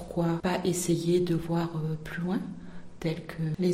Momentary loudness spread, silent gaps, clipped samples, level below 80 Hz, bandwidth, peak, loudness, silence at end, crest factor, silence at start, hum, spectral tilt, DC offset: 9 LU; none; under 0.1%; -52 dBFS; 16 kHz; -16 dBFS; -30 LUFS; 0 s; 14 dB; 0 s; none; -6 dB/octave; under 0.1%